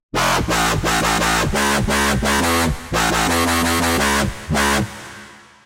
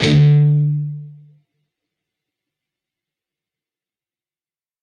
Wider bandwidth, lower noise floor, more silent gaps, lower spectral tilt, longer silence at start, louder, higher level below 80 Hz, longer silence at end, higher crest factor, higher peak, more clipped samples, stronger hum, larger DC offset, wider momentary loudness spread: first, 16 kHz vs 7.4 kHz; second, -41 dBFS vs under -90 dBFS; neither; second, -3.5 dB/octave vs -7.5 dB/octave; first, 0.15 s vs 0 s; second, -17 LUFS vs -14 LUFS; first, -30 dBFS vs -50 dBFS; second, 0.3 s vs 3.7 s; about the same, 14 dB vs 18 dB; about the same, -4 dBFS vs -2 dBFS; neither; neither; neither; second, 4 LU vs 17 LU